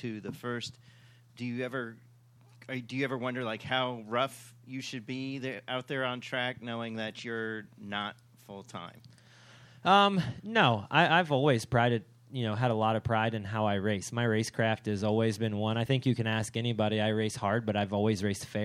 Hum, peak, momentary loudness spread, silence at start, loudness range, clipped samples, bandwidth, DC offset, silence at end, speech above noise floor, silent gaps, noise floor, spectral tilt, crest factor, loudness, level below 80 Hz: none; -8 dBFS; 15 LU; 0 s; 10 LU; under 0.1%; 14 kHz; under 0.1%; 0 s; 28 dB; none; -59 dBFS; -5.5 dB/octave; 24 dB; -31 LUFS; -66 dBFS